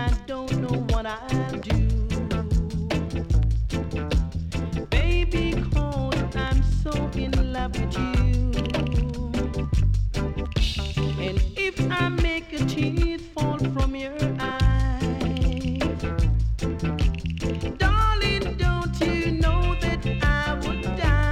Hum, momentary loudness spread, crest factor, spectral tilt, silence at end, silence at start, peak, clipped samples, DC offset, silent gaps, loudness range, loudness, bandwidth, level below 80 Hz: none; 5 LU; 14 dB; -6.5 dB/octave; 0 s; 0 s; -8 dBFS; under 0.1%; under 0.1%; none; 2 LU; -25 LUFS; 11 kHz; -26 dBFS